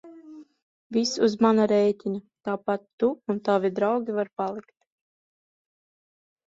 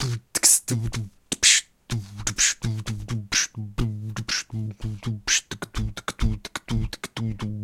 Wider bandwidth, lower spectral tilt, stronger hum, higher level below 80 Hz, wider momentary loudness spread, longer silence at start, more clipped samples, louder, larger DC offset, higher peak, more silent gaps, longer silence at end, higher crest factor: second, 7.8 kHz vs 16.5 kHz; first, -5.5 dB/octave vs -2 dB/octave; neither; second, -70 dBFS vs -38 dBFS; second, 12 LU vs 16 LU; about the same, 0.05 s vs 0 s; neither; about the same, -25 LUFS vs -24 LUFS; neither; second, -8 dBFS vs -2 dBFS; first, 0.62-0.90 s, 2.93-2.98 s vs none; first, 1.85 s vs 0 s; second, 18 dB vs 24 dB